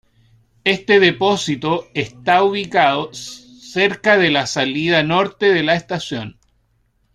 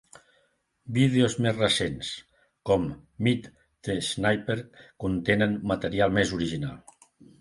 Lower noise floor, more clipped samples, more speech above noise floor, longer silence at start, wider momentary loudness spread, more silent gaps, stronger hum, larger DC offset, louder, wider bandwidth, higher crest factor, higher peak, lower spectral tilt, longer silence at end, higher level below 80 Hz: second, -62 dBFS vs -69 dBFS; neither; about the same, 46 dB vs 43 dB; second, 0.65 s vs 0.85 s; about the same, 14 LU vs 12 LU; neither; neither; neither; first, -16 LUFS vs -27 LUFS; about the same, 11.5 kHz vs 11.5 kHz; about the same, 16 dB vs 20 dB; first, -2 dBFS vs -8 dBFS; about the same, -4.5 dB/octave vs -5.5 dB/octave; first, 0.85 s vs 0.6 s; about the same, -56 dBFS vs -52 dBFS